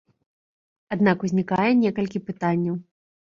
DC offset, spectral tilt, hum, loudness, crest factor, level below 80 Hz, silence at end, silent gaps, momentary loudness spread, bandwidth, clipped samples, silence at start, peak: under 0.1%; -8 dB/octave; none; -23 LUFS; 18 dB; -62 dBFS; 0.4 s; none; 9 LU; 7.4 kHz; under 0.1%; 0.9 s; -6 dBFS